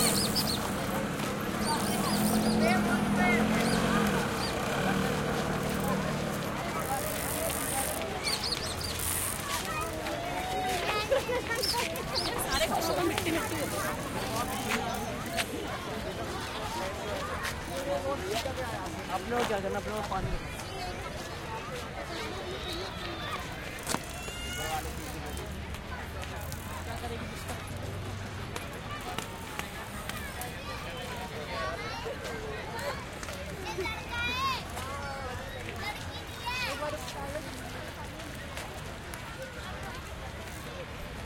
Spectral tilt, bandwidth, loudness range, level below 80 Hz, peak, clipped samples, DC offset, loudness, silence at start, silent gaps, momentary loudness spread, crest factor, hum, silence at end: -4 dB/octave; 17 kHz; 10 LU; -48 dBFS; -10 dBFS; under 0.1%; under 0.1%; -33 LUFS; 0 s; none; 11 LU; 24 dB; none; 0 s